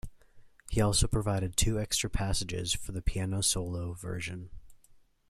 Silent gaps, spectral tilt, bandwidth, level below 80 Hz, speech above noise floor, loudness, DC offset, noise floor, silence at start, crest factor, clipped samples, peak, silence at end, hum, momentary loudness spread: none; -4 dB/octave; 15 kHz; -40 dBFS; 30 dB; -31 LUFS; under 0.1%; -60 dBFS; 0.05 s; 20 dB; under 0.1%; -12 dBFS; 0.3 s; none; 10 LU